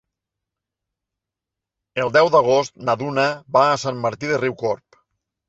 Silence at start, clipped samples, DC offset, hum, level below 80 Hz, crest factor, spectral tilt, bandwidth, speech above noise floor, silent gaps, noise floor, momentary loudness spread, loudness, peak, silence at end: 1.95 s; under 0.1%; under 0.1%; none; -62 dBFS; 20 dB; -5 dB/octave; 8 kHz; 67 dB; none; -86 dBFS; 11 LU; -19 LUFS; -2 dBFS; 0.75 s